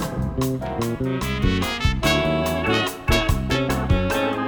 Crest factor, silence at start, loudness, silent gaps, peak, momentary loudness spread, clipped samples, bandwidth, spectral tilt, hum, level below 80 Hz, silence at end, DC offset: 16 dB; 0 s; -22 LUFS; none; -6 dBFS; 5 LU; under 0.1%; over 20 kHz; -5.5 dB/octave; none; -30 dBFS; 0 s; under 0.1%